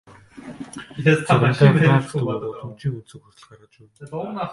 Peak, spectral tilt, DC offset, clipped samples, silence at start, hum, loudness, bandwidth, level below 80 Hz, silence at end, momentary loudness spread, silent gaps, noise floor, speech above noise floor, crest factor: -2 dBFS; -7.5 dB/octave; under 0.1%; under 0.1%; 0.35 s; none; -19 LUFS; 11.5 kHz; -56 dBFS; 0 s; 22 LU; none; -40 dBFS; 20 dB; 20 dB